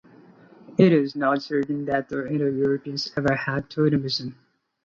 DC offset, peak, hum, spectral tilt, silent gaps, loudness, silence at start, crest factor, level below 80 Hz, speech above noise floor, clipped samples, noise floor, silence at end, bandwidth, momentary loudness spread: under 0.1%; -4 dBFS; none; -7 dB/octave; none; -24 LUFS; 0.7 s; 20 dB; -58 dBFS; 28 dB; under 0.1%; -51 dBFS; 0.55 s; 7.4 kHz; 10 LU